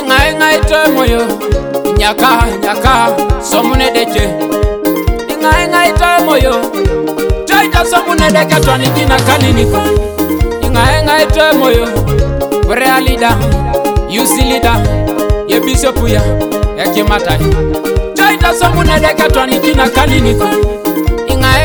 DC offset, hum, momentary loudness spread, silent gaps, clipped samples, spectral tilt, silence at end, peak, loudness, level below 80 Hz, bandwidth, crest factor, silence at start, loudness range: under 0.1%; none; 5 LU; none; 0.5%; -5 dB/octave; 0 s; 0 dBFS; -10 LUFS; -18 dBFS; over 20 kHz; 10 dB; 0 s; 2 LU